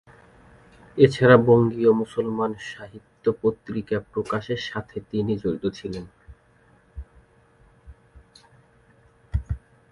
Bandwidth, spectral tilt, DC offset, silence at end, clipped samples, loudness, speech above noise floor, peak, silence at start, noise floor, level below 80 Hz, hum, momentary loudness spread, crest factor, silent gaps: 11 kHz; -7.5 dB/octave; under 0.1%; 0.35 s; under 0.1%; -23 LUFS; 36 dB; -2 dBFS; 0.95 s; -58 dBFS; -44 dBFS; none; 21 LU; 22 dB; none